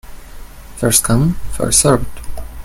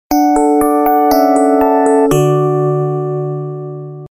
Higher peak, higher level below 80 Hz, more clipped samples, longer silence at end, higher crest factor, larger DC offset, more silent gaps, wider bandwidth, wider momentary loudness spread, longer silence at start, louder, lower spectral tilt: about the same, 0 dBFS vs 0 dBFS; first, -28 dBFS vs -40 dBFS; neither; about the same, 0 s vs 0.05 s; about the same, 16 dB vs 12 dB; neither; neither; about the same, 17 kHz vs 17 kHz; first, 19 LU vs 12 LU; about the same, 0.05 s vs 0.1 s; about the same, -14 LUFS vs -12 LUFS; second, -4 dB/octave vs -7 dB/octave